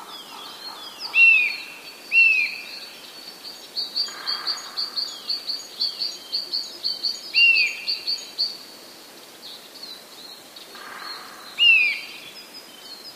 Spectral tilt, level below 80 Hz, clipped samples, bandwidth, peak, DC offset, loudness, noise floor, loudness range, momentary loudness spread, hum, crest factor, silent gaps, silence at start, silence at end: 1.5 dB/octave; -80 dBFS; under 0.1%; 15.5 kHz; -6 dBFS; under 0.1%; -19 LUFS; -44 dBFS; 9 LU; 25 LU; none; 18 dB; none; 0 s; 0 s